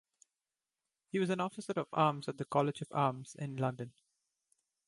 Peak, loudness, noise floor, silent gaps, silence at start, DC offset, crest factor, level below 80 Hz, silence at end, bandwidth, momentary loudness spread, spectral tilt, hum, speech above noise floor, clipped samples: -14 dBFS; -35 LUFS; under -90 dBFS; none; 1.15 s; under 0.1%; 22 dB; -78 dBFS; 1 s; 11.5 kHz; 11 LU; -6.5 dB/octave; none; over 55 dB; under 0.1%